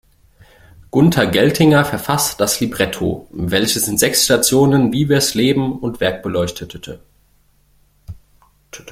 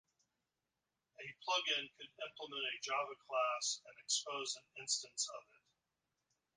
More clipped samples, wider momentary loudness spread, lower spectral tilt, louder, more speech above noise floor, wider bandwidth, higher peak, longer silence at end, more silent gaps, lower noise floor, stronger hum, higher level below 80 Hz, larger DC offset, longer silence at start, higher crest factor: neither; about the same, 11 LU vs 12 LU; first, -4 dB/octave vs 1 dB/octave; first, -15 LUFS vs -40 LUFS; second, 40 dB vs over 48 dB; first, 16.5 kHz vs 10 kHz; first, 0 dBFS vs -24 dBFS; second, 0 s vs 1.15 s; neither; second, -55 dBFS vs under -90 dBFS; neither; first, -44 dBFS vs under -90 dBFS; neither; second, 0.95 s vs 1.2 s; about the same, 16 dB vs 20 dB